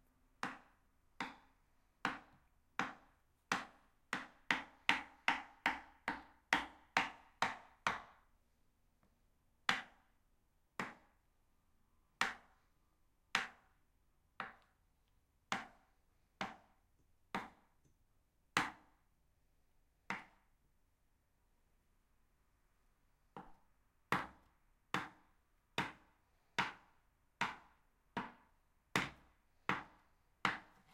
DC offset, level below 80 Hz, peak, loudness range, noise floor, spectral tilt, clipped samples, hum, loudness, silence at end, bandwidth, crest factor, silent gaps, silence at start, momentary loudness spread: under 0.1%; -74 dBFS; -12 dBFS; 10 LU; -77 dBFS; -2.5 dB/octave; under 0.1%; none; -42 LUFS; 0.3 s; 16 kHz; 36 dB; none; 0.45 s; 15 LU